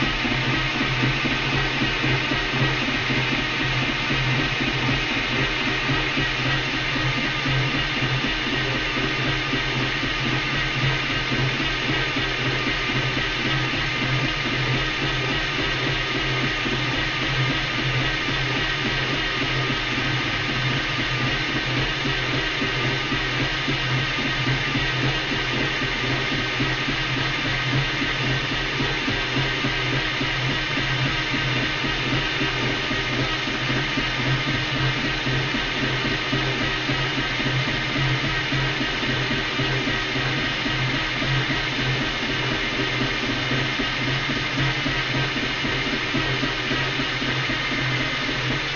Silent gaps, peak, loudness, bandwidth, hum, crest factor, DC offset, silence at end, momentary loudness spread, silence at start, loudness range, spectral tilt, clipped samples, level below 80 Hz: none; -8 dBFS; -22 LUFS; 7.4 kHz; none; 14 dB; under 0.1%; 0 s; 1 LU; 0 s; 1 LU; -2.5 dB/octave; under 0.1%; -38 dBFS